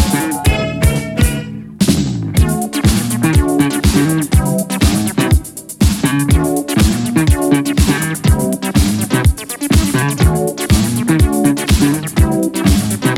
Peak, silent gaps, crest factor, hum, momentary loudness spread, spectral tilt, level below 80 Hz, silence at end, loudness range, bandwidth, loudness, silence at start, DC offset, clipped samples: 0 dBFS; none; 12 dB; none; 3 LU; -5.5 dB/octave; -20 dBFS; 0 s; 1 LU; 17.5 kHz; -14 LUFS; 0 s; under 0.1%; under 0.1%